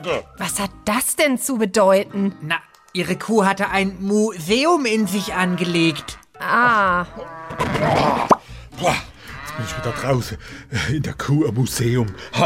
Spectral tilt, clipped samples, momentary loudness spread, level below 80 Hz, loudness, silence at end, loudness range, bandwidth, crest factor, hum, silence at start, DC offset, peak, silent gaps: -4.5 dB/octave; under 0.1%; 13 LU; -44 dBFS; -20 LUFS; 0 s; 4 LU; 16 kHz; 18 dB; none; 0 s; under 0.1%; -2 dBFS; none